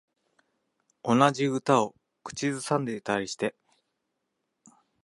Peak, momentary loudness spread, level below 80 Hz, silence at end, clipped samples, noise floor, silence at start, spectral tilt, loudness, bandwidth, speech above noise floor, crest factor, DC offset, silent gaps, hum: -6 dBFS; 12 LU; -70 dBFS; 1.55 s; under 0.1%; -81 dBFS; 1.05 s; -5 dB/octave; -27 LUFS; 11.5 kHz; 54 dB; 24 dB; under 0.1%; none; none